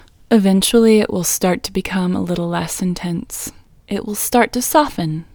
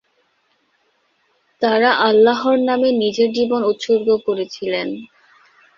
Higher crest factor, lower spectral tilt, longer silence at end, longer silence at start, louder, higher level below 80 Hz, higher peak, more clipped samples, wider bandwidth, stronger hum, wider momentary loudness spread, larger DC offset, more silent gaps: about the same, 16 dB vs 18 dB; about the same, -4.5 dB/octave vs -5 dB/octave; second, 0.1 s vs 0.7 s; second, 0.3 s vs 1.6 s; about the same, -17 LUFS vs -17 LUFS; first, -44 dBFS vs -64 dBFS; about the same, 0 dBFS vs -2 dBFS; neither; first, over 20 kHz vs 7.4 kHz; neither; about the same, 12 LU vs 10 LU; neither; neither